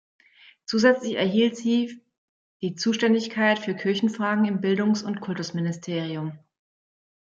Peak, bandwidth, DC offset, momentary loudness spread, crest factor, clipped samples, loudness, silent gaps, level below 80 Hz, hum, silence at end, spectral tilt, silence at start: -4 dBFS; 7.6 kHz; under 0.1%; 11 LU; 20 dB; under 0.1%; -24 LUFS; 2.18-2.60 s; -72 dBFS; none; 0.9 s; -5.5 dB/octave; 0.7 s